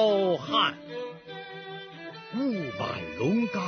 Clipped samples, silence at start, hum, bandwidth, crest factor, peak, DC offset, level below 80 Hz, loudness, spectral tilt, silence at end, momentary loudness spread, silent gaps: under 0.1%; 0 s; none; 6.6 kHz; 18 dB; -12 dBFS; under 0.1%; -66 dBFS; -29 LUFS; -6 dB/octave; 0 s; 16 LU; none